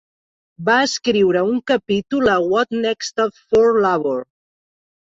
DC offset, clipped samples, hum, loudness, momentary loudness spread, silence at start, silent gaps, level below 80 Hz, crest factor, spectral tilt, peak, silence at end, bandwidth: under 0.1%; under 0.1%; none; -18 LUFS; 7 LU; 0.6 s; none; -54 dBFS; 16 dB; -4.5 dB/octave; -4 dBFS; 0.85 s; 7.8 kHz